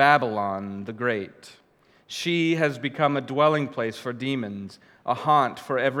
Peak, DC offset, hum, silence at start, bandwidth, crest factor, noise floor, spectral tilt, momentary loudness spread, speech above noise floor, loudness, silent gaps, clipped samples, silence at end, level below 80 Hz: -2 dBFS; under 0.1%; none; 0 s; 15.5 kHz; 22 dB; -59 dBFS; -5.5 dB/octave; 13 LU; 35 dB; -25 LUFS; none; under 0.1%; 0 s; -74 dBFS